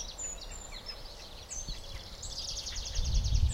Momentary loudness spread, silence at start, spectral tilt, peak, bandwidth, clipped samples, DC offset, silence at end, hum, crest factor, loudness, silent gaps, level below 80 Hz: 12 LU; 0 s; -3 dB/octave; -16 dBFS; 16 kHz; under 0.1%; under 0.1%; 0 s; none; 20 dB; -38 LUFS; none; -36 dBFS